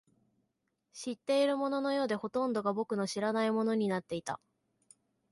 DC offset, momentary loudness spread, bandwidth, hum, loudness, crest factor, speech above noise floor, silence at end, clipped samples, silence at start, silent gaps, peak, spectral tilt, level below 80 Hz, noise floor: under 0.1%; 12 LU; 11.5 kHz; none; -33 LUFS; 16 dB; 49 dB; 0.95 s; under 0.1%; 0.95 s; none; -18 dBFS; -5 dB/octave; -76 dBFS; -82 dBFS